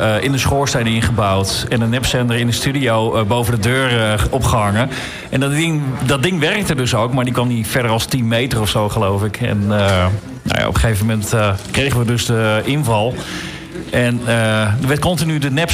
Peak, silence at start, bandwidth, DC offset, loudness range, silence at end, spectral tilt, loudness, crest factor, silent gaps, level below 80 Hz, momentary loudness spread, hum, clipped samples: -6 dBFS; 0 s; 16 kHz; under 0.1%; 1 LU; 0 s; -5 dB/octave; -16 LUFS; 10 dB; none; -34 dBFS; 4 LU; none; under 0.1%